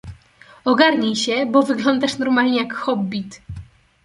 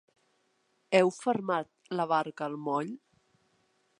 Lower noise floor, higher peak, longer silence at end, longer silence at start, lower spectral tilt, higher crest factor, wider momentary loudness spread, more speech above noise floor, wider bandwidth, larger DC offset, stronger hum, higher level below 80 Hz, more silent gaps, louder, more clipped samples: second, -48 dBFS vs -73 dBFS; first, -2 dBFS vs -10 dBFS; second, 0.4 s vs 1 s; second, 0.05 s vs 0.9 s; about the same, -4.5 dB/octave vs -5.5 dB/octave; about the same, 18 dB vs 22 dB; first, 18 LU vs 11 LU; second, 30 dB vs 44 dB; about the same, 11.5 kHz vs 11 kHz; neither; neither; first, -50 dBFS vs -84 dBFS; neither; first, -18 LUFS vs -30 LUFS; neither